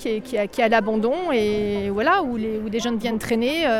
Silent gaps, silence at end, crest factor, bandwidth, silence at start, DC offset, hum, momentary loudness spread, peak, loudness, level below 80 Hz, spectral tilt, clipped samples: none; 0 s; 16 dB; 16.5 kHz; 0 s; under 0.1%; none; 6 LU; -6 dBFS; -22 LUFS; -48 dBFS; -5 dB/octave; under 0.1%